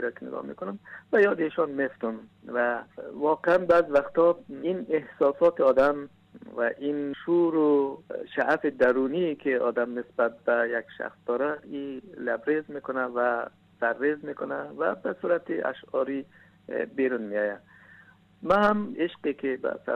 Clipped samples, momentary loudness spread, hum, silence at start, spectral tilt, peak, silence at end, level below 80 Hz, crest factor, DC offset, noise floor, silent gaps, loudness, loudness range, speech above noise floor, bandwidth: under 0.1%; 14 LU; none; 0 s; -7.5 dB/octave; -12 dBFS; 0 s; -64 dBFS; 16 dB; under 0.1%; -55 dBFS; none; -27 LUFS; 5 LU; 29 dB; 6.4 kHz